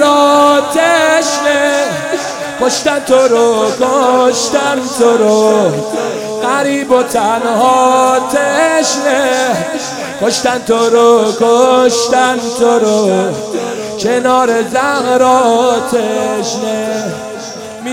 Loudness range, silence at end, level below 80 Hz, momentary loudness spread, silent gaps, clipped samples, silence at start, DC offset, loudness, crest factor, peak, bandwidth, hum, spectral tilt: 2 LU; 0 s; -52 dBFS; 9 LU; none; 0.2%; 0 s; under 0.1%; -11 LUFS; 10 dB; 0 dBFS; 16.5 kHz; none; -3 dB/octave